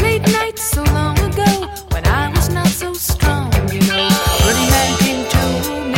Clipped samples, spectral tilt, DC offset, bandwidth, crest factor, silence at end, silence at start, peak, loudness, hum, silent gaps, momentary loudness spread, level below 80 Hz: under 0.1%; -4.5 dB/octave; under 0.1%; 17 kHz; 14 dB; 0 s; 0 s; 0 dBFS; -15 LUFS; none; none; 6 LU; -22 dBFS